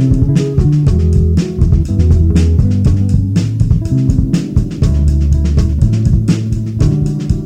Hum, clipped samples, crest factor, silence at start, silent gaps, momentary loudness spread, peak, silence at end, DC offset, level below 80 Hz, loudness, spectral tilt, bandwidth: none; under 0.1%; 10 dB; 0 s; none; 3 LU; 0 dBFS; 0 s; under 0.1%; -16 dBFS; -13 LUFS; -8.5 dB/octave; 9.6 kHz